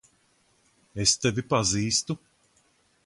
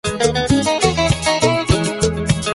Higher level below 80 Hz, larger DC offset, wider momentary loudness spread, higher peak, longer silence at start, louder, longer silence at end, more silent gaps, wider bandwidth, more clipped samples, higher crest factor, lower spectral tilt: second, -54 dBFS vs -32 dBFS; neither; first, 14 LU vs 3 LU; second, -6 dBFS vs -2 dBFS; first, 0.95 s vs 0.05 s; second, -25 LUFS vs -16 LUFS; first, 0.9 s vs 0 s; neither; about the same, 11.5 kHz vs 11.5 kHz; neither; first, 22 dB vs 16 dB; second, -3 dB/octave vs -4.5 dB/octave